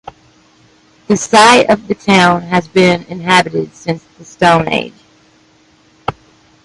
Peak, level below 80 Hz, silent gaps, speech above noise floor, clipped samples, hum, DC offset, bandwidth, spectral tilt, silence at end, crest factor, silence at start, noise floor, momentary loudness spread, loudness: 0 dBFS; -48 dBFS; none; 38 dB; under 0.1%; none; under 0.1%; 11.5 kHz; -4.5 dB/octave; 0.55 s; 14 dB; 1.1 s; -49 dBFS; 18 LU; -11 LUFS